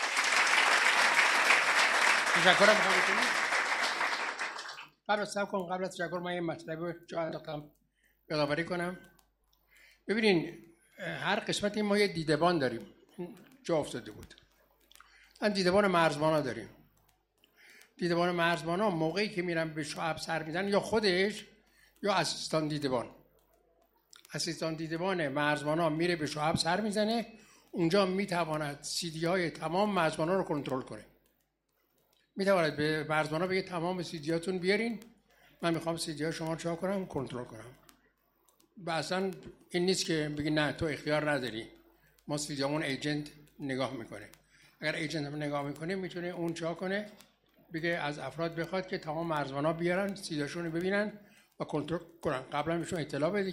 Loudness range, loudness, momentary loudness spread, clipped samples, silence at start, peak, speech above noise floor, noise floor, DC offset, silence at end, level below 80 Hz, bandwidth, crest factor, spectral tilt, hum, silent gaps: 8 LU; -31 LUFS; 16 LU; under 0.1%; 0 s; -10 dBFS; 45 dB; -77 dBFS; under 0.1%; 0 s; -66 dBFS; 16 kHz; 24 dB; -4 dB/octave; none; none